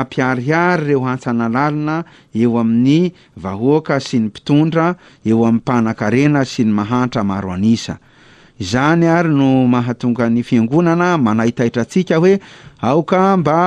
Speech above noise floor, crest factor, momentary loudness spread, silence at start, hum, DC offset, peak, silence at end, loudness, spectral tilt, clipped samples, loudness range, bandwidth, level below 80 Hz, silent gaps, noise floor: 31 dB; 12 dB; 7 LU; 0 s; none; under 0.1%; -2 dBFS; 0 s; -15 LUFS; -7 dB/octave; under 0.1%; 2 LU; 9.8 kHz; -50 dBFS; none; -45 dBFS